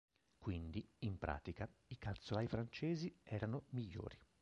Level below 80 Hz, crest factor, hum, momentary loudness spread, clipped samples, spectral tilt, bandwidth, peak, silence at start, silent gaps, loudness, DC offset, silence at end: -58 dBFS; 22 dB; none; 8 LU; under 0.1%; -7.5 dB/octave; 8 kHz; -24 dBFS; 0.4 s; none; -47 LUFS; under 0.1%; 0.2 s